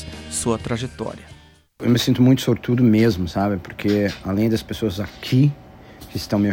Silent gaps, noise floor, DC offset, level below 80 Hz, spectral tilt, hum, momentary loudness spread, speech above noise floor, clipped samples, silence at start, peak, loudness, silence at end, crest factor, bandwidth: none; -41 dBFS; under 0.1%; -44 dBFS; -6 dB/octave; none; 14 LU; 22 dB; under 0.1%; 0 s; -4 dBFS; -20 LUFS; 0 s; 16 dB; 17 kHz